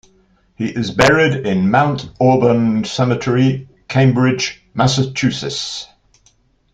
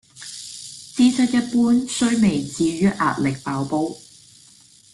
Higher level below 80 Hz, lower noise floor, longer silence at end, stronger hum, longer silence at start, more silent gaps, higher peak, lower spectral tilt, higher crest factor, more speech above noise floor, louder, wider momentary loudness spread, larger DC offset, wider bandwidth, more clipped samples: first, -46 dBFS vs -54 dBFS; first, -56 dBFS vs -50 dBFS; about the same, 0.9 s vs 0.95 s; neither; first, 0.6 s vs 0.15 s; neither; first, 0 dBFS vs -6 dBFS; about the same, -5.5 dB/octave vs -5 dB/octave; about the same, 16 dB vs 14 dB; first, 41 dB vs 31 dB; first, -16 LUFS vs -20 LUFS; second, 10 LU vs 16 LU; neither; second, 9.2 kHz vs 12 kHz; neither